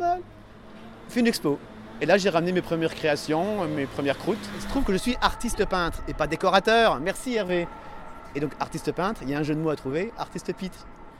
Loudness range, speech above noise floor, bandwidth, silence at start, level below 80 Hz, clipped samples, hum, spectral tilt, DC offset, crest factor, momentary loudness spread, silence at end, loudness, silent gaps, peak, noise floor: 5 LU; 21 dB; 16.5 kHz; 0 s; -42 dBFS; under 0.1%; none; -5 dB/octave; under 0.1%; 22 dB; 15 LU; 0 s; -26 LUFS; none; -4 dBFS; -46 dBFS